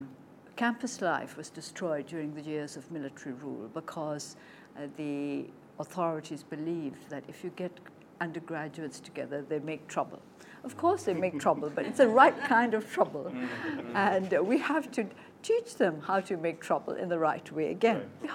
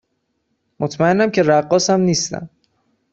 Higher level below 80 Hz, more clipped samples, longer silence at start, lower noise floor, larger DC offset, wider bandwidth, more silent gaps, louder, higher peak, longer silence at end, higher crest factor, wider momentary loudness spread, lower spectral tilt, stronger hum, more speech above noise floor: second, -80 dBFS vs -56 dBFS; neither; second, 0 s vs 0.8 s; second, -53 dBFS vs -70 dBFS; neither; first, 16 kHz vs 8.2 kHz; neither; second, -31 LUFS vs -16 LUFS; second, -6 dBFS vs -2 dBFS; second, 0 s vs 0.65 s; first, 26 dB vs 16 dB; first, 16 LU vs 11 LU; about the same, -5.5 dB/octave vs -4.5 dB/octave; neither; second, 22 dB vs 54 dB